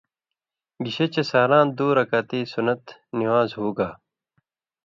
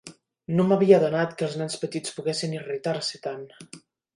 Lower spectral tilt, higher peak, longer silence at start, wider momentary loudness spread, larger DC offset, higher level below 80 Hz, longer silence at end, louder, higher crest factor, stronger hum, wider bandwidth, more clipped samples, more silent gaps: first, -7 dB/octave vs -5.5 dB/octave; about the same, -6 dBFS vs -4 dBFS; first, 0.8 s vs 0.05 s; second, 12 LU vs 19 LU; neither; about the same, -64 dBFS vs -68 dBFS; first, 0.9 s vs 0.4 s; first, -22 LUFS vs -25 LUFS; about the same, 18 dB vs 22 dB; neither; second, 7.4 kHz vs 11.5 kHz; neither; neither